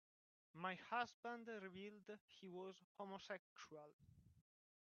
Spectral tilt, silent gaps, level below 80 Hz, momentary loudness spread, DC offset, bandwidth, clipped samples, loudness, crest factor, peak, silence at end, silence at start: -2.5 dB/octave; 1.14-1.23 s, 2.21-2.28 s, 2.84-2.95 s, 3.39-3.56 s, 3.93-3.99 s; -90 dBFS; 14 LU; under 0.1%; 7 kHz; under 0.1%; -53 LUFS; 24 dB; -32 dBFS; 0.4 s; 0.55 s